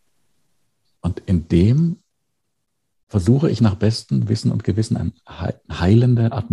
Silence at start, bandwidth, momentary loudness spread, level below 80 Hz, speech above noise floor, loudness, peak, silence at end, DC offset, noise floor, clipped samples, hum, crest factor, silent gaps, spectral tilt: 1.05 s; 11 kHz; 13 LU; -40 dBFS; 59 dB; -19 LUFS; -2 dBFS; 0 s; under 0.1%; -76 dBFS; under 0.1%; none; 16 dB; 3.03-3.07 s; -8 dB/octave